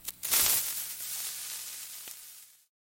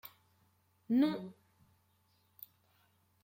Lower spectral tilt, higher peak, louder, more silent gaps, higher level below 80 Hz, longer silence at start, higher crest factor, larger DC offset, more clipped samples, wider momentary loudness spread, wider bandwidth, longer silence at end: second, 1.5 dB/octave vs -7 dB/octave; first, -8 dBFS vs -20 dBFS; first, -29 LUFS vs -34 LUFS; neither; first, -64 dBFS vs -84 dBFS; about the same, 0 s vs 0.05 s; first, 26 dB vs 20 dB; neither; neither; second, 19 LU vs 23 LU; about the same, 17 kHz vs 16.5 kHz; second, 0.4 s vs 1.9 s